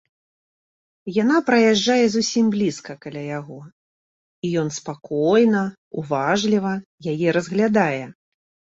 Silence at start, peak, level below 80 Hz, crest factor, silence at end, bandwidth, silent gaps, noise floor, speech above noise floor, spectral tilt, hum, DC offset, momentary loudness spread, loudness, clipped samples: 1.05 s; -4 dBFS; -62 dBFS; 18 dB; 0.6 s; 7.8 kHz; 3.72-4.42 s, 5.78-5.91 s, 6.85-6.98 s; under -90 dBFS; over 70 dB; -5 dB/octave; none; under 0.1%; 16 LU; -20 LUFS; under 0.1%